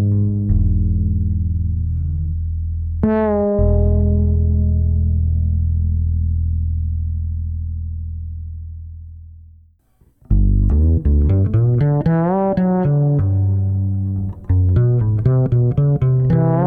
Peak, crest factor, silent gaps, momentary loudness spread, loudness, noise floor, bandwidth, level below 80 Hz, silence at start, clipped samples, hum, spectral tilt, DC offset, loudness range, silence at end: -4 dBFS; 12 dB; none; 10 LU; -18 LUFS; -55 dBFS; 2.5 kHz; -24 dBFS; 0 s; under 0.1%; none; -13 dB/octave; under 0.1%; 8 LU; 0 s